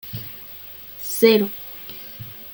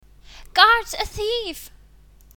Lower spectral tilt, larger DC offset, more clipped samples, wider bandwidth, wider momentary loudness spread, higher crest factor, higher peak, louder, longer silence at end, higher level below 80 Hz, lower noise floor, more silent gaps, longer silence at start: first, -4.5 dB/octave vs -1.5 dB/octave; neither; neither; second, 17 kHz vs 20 kHz; about the same, 19 LU vs 17 LU; about the same, 22 dB vs 22 dB; about the same, -2 dBFS vs 0 dBFS; about the same, -20 LUFS vs -19 LUFS; second, 0 s vs 0.7 s; second, -60 dBFS vs -42 dBFS; second, -39 dBFS vs -50 dBFS; neither; second, 0.05 s vs 0.35 s